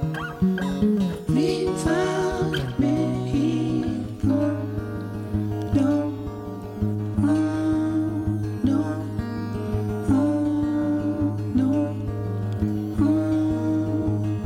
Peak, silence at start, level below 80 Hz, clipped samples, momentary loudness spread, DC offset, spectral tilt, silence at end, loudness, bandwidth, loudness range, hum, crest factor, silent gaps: -10 dBFS; 0 s; -42 dBFS; under 0.1%; 7 LU; under 0.1%; -7.5 dB/octave; 0 s; -24 LUFS; 14.5 kHz; 2 LU; none; 14 dB; none